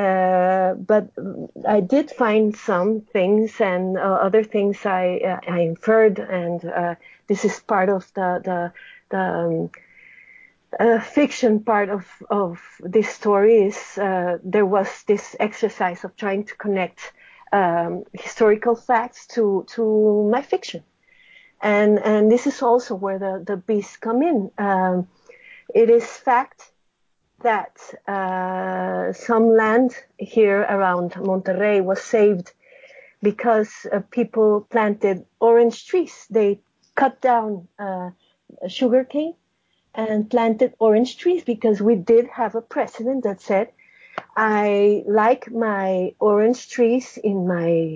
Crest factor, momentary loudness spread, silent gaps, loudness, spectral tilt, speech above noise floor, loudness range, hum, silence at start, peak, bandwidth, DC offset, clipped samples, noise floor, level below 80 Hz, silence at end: 14 dB; 11 LU; none; -20 LUFS; -6.5 dB/octave; 49 dB; 4 LU; none; 0 s; -6 dBFS; 7.8 kHz; under 0.1%; under 0.1%; -68 dBFS; -68 dBFS; 0 s